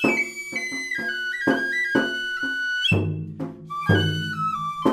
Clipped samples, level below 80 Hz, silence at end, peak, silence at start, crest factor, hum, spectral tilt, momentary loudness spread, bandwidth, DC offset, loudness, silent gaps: under 0.1%; -58 dBFS; 0 s; -4 dBFS; 0 s; 20 dB; none; -5 dB/octave; 8 LU; 15 kHz; under 0.1%; -24 LUFS; none